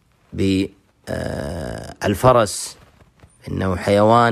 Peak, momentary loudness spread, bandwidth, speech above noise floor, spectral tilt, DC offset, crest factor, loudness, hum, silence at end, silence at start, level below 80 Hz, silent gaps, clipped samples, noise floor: -2 dBFS; 16 LU; 15.5 kHz; 33 dB; -5.5 dB/octave; under 0.1%; 18 dB; -19 LUFS; none; 0 s; 0.3 s; -42 dBFS; none; under 0.1%; -51 dBFS